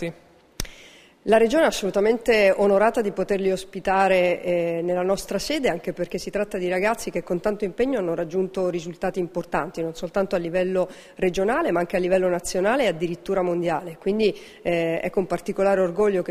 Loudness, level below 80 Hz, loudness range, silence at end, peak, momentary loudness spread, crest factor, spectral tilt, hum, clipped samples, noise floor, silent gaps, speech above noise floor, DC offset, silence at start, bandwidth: -23 LUFS; -48 dBFS; 5 LU; 0 s; -4 dBFS; 10 LU; 18 dB; -5 dB/octave; none; under 0.1%; -49 dBFS; none; 26 dB; under 0.1%; 0 s; 15.5 kHz